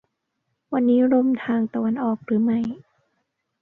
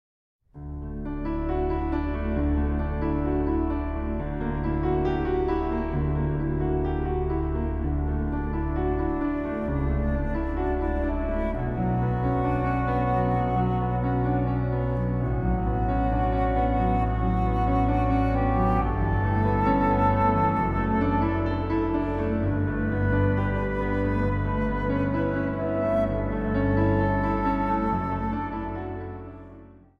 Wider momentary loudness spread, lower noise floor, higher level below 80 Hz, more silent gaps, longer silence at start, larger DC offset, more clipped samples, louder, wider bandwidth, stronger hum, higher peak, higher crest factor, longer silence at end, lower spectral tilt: first, 10 LU vs 6 LU; first, -76 dBFS vs -48 dBFS; second, -66 dBFS vs -32 dBFS; neither; first, 0.7 s vs 0.55 s; neither; neither; first, -22 LUFS vs -26 LUFS; second, 3.8 kHz vs 5.4 kHz; neither; about the same, -8 dBFS vs -10 dBFS; about the same, 14 dB vs 14 dB; first, 0.85 s vs 0.25 s; about the same, -9.5 dB/octave vs -10.5 dB/octave